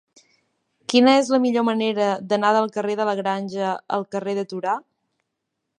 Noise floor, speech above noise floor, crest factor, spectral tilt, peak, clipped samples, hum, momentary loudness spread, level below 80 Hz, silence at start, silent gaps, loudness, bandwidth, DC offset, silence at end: -79 dBFS; 59 dB; 18 dB; -5 dB/octave; -4 dBFS; under 0.1%; none; 10 LU; -74 dBFS; 0.9 s; none; -21 LUFS; 11 kHz; under 0.1%; 1 s